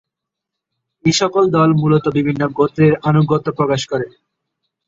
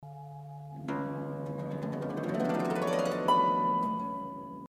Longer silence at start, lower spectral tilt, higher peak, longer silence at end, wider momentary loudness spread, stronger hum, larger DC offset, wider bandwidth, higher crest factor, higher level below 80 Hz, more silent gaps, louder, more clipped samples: first, 1.05 s vs 0 s; about the same, -6 dB/octave vs -6.5 dB/octave; first, -2 dBFS vs -14 dBFS; first, 0.8 s vs 0 s; second, 7 LU vs 18 LU; neither; neither; second, 8 kHz vs 15.5 kHz; about the same, 14 dB vs 18 dB; first, -52 dBFS vs -68 dBFS; neither; first, -15 LUFS vs -31 LUFS; neither